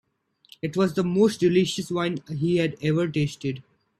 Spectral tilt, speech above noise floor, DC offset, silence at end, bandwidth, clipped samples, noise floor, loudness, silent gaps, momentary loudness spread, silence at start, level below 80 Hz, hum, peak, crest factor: -6.5 dB/octave; 33 dB; under 0.1%; 0.4 s; 13.5 kHz; under 0.1%; -56 dBFS; -24 LUFS; none; 11 LU; 0.65 s; -60 dBFS; none; -8 dBFS; 16 dB